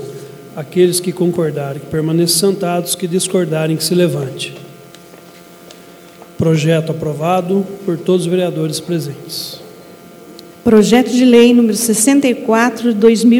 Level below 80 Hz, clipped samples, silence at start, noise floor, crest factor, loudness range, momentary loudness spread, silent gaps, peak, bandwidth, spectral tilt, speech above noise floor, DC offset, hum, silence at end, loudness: -52 dBFS; under 0.1%; 0 s; -38 dBFS; 14 dB; 7 LU; 14 LU; none; 0 dBFS; 19 kHz; -5 dB/octave; 26 dB; under 0.1%; none; 0 s; -14 LUFS